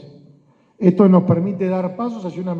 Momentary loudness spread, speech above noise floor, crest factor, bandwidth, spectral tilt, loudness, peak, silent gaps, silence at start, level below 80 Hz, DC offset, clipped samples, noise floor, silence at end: 13 LU; 36 dB; 18 dB; 4.6 kHz; -10.5 dB/octave; -17 LUFS; 0 dBFS; none; 0.05 s; -64 dBFS; under 0.1%; under 0.1%; -53 dBFS; 0 s